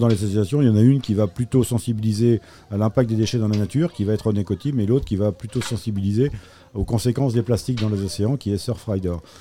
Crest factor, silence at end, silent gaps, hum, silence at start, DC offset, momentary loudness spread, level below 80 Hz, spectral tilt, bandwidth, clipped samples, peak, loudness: 16 dB; 0.2 s; none; none; 0 s; 0.2%; 7 LU; -42 dBFS; -7.5 dB/octave; 15.5 kHz; under 0.1%; -4 dBFS; -21 LUFS